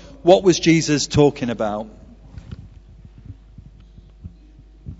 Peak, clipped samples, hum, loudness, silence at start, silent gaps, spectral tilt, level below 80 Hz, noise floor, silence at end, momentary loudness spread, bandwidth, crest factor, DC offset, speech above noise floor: 0 dBFS; under 0.1%; none; -17 LUFS; 0.25 s; none; -5 dB/octave; -42 dBFS; -45 dBFS; 0.05 s; 25 LU; 8 kHz; 20 dB; under 0.1%; 29 dB